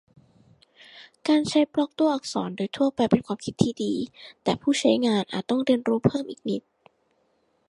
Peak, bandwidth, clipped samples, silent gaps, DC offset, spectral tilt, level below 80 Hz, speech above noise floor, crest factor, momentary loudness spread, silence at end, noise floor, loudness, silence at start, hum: -4 dBFS; 11.5 kHz; under 0.1%; none; under 0.1%; -5.5 dB/octave; -60 dBFS; 44 dB; 22 dB; 10 LU; 1.1 s; -68 dBFS; -25 LUFS; 0.95 s; none